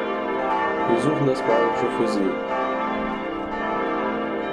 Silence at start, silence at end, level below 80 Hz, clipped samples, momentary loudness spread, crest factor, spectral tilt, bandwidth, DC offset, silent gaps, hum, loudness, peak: 0 s; 0 s; -52 dBFS; under 0.1%; 6 LU; 16 dB; -6.5 dB/octave; 11.5 kHz; under 0.1%; none; none; -23 LUFS; -6 dBFS